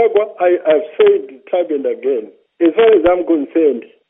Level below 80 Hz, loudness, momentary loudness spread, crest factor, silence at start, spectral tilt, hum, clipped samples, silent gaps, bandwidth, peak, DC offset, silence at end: -50 dBFS; -14 LUFS; 9 LU; 14 dB; 0 s; -3 dB/octave; none; under 0.1%; none; 3.8 kHz; 0 dBFS; under 0.1%; 0.3 s